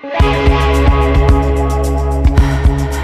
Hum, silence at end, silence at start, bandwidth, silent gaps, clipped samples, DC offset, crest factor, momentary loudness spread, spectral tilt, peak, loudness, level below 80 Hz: none; 0 s; 0.05 s; 12.5 kHz; none; under 0.1%; under 0.1%; 10 dB; 4 LU; -7 dB/octave; 0 dBFS; -13 LUFS; -14 dBFS